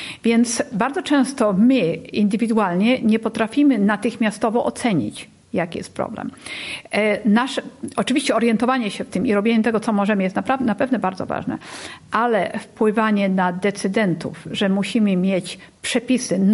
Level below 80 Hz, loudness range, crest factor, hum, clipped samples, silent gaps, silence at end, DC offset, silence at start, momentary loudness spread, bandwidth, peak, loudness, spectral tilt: -56 dBFS; 4 LU; 16 dB; none; under 0.1%; none; 0 s; under 0.1%; 0 s; 11 LU; 11.5 kHz; -4 dBFS; -20 LUFS; -5.5 dB/octave